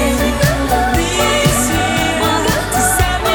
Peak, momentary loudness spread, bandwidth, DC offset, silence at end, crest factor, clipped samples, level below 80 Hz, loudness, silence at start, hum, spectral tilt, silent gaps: 0 dBFS; 2 LU; over 20 kHz; under 0.1%; 0 s; 14 dB; under 0.1%; -24 dBFS; -14 LUFS; 0 s; none; -3.5 dB/octave; none